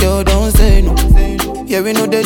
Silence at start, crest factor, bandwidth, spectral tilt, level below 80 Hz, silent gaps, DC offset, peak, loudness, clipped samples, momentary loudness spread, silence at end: 0 s; 10 dB; 18 kHz; -5.5 dB/octave; -12 dBFS; none; under 0.1%; 0 dBFS; -13 LUFS; under 0.1%; 6 LU; 0 s